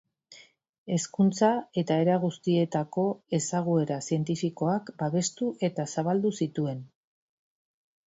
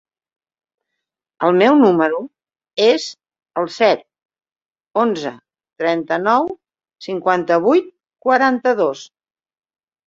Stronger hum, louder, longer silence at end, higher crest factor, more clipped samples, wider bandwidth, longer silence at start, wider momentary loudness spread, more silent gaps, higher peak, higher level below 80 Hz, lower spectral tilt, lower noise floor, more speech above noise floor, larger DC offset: neither; second, -28 LUFS vs -17 LUFS; first, 1.25 s vs 1.05 s; about the same, 18 dB vs 18 dB; neither; about the same, 8 kHz vs 7.8 kHz; second, 0.3 s vs 1.4 s; second, 6 LU vs 16 LU; first, 0.69-0.86 s vs 4.25-4.29 s; second, -10 dBFS vs -2 dBFS; about the same, -70 dBFS vs -66 dBFS; about the same, -6 dB/octave vs -5.5 dB/octave; second, -55 dBFS vs -80 dBFS; second, 28 dB vs 64 dB; neither